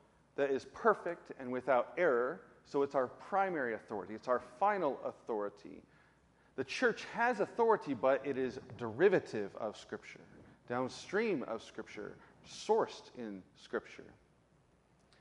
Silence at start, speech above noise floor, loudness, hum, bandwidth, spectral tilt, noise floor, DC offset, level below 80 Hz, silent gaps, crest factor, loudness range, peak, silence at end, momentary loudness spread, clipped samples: 0.4 s; 34 dB; -36 LUFS; none; 11 kHz; -5.5 dB/octave; -70 dBFS; under 0.1%; -76 dBFS; none; 22 dB; 7 LU; -16 dBFS; 1.1 s; 16 LU; under 0.1%